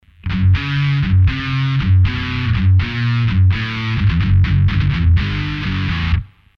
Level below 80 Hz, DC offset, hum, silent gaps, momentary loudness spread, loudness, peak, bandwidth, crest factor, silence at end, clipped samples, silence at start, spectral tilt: -26 dBFS; under 0.1%; none; none; 6 LU; -16 LUFS; -4 dBFS; 6 kHz; 10 dB; 0.3 s; under 0.1%; 0.25 s; -7.5 dB/octave